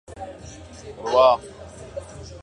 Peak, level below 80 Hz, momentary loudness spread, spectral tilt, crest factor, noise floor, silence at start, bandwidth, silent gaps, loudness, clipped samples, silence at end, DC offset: -4 dBFS; -48 dBFS; 24 LU; -4.5 dB/octave; 20 dB; -41 dBFS; 0.1 s; 10.5 kHz; none; -19 LUFS; under 0.1%; 0.05 s; under 0.1%